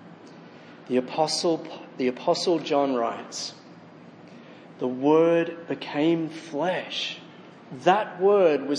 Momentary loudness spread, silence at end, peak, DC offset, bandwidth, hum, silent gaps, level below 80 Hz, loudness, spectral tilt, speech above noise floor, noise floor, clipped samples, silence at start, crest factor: 13 LU; 0 s; -4 dBFS; under 0.1%; 10.5 kHz; none; none; -82 dBFS; -25 LUFS; -4.5 dB/octave; 23 dB; -47 dBFS; under 0.1%; 0 s; 20 dB